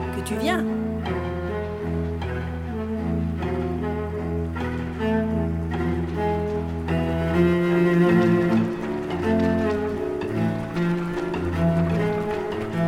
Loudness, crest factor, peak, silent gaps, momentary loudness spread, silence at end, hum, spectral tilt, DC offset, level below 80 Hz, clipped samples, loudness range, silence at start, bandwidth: -24 LUFS; 16 dB; -8 dBFS; none; 8 LU; 0 s; none; -8 dB/octave; under 0.1%; -38 dBFS; under 0.1%; 6 LU; 0 s; 13 kHz